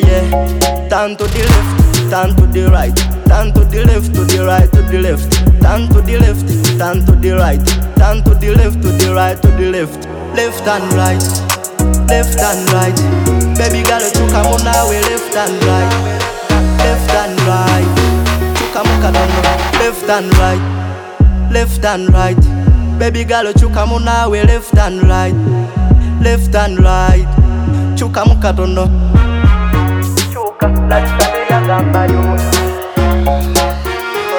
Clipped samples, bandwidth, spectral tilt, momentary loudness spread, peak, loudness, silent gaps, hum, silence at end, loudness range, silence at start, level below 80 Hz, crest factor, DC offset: under 0.1%; over 20 kHz; -5.5 dB/octave; 5 LU; 0 dBFS; -12 LUFS; none; none; 0 s; 2 LU; 0 s; -14 dBFS; 10 dB; under 0.1%